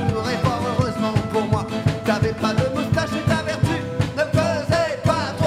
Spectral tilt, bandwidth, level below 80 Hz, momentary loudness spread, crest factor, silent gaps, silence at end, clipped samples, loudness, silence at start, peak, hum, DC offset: -6 dB/octave; 15 kHz; -40 dBFS; 2 LU; 16 dB; none; 0 s; under 0.1%; -21 LUFS; 0 s; -4 dBFS; none; under 0.1%